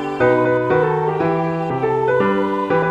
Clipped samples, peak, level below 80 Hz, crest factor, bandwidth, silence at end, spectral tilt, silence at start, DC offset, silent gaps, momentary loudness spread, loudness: under 0.1%; -4 dBFS; -50 dBFS; 14 dB; 8.2 kHz; 0 s; -8.5 dB/octave; 0 s; under 0.1%; none; 4 LU; -18 LUFS